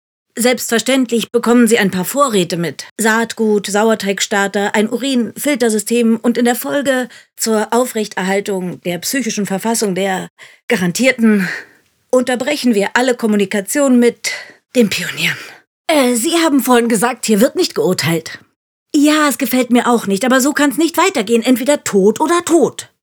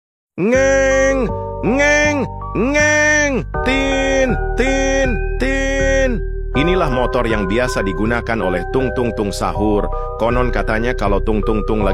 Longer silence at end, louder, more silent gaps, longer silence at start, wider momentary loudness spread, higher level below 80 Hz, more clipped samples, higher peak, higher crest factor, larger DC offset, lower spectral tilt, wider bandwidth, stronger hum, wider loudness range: first, 0.15 s vs 0 s; about the same, -14 LUFS vs -16 LUFS; first, 2.91-2.96 s, 10.30-10.36 s, 10.63-10.68 s, 15.67-15.85 s, 18.56-18.86 s vs none; about the same, 0.35 s vs 0.35 s; about the same, 8 LU vs 7 LU; second, -64 dBFS vs -24 dBFS; neither; about the same, 0 dBFS vs -2 dBFS; about the same, 14 dB vs 14 dB; second, under 0.1% vs 0.1%; about the same, -4 dB/octave vs -5 dB/octave; first, over 20 kHz vs 12.5 kHz; neither; about the same, 3 LU vs 4 LU